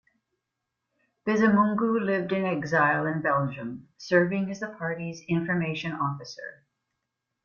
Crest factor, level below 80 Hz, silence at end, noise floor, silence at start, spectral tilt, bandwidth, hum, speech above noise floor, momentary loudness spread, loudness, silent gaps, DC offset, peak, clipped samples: 18 dB; -66 dBFS; 0.9 s; -83 dBFS; 1.25 s; -7 dB/octave; 7 kHz; none; 57 dB; 15 LU; -26 LUFS; none; under 0.1%; -10 dBFS; under 0.1%